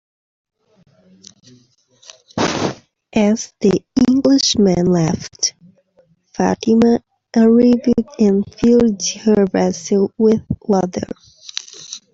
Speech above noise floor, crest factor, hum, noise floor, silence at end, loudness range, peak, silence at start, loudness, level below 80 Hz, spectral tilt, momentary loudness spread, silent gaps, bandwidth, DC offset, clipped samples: 42 dB; 16 dB; none; -56 dBFS; 0.15 s; 7 LU; 0 dBFS; 2.35 s; -16 LUFS; -48 dBFS; -5 dB/octave; 15 LU; none; 7.8 kHz; under 0.1%; under 0.1%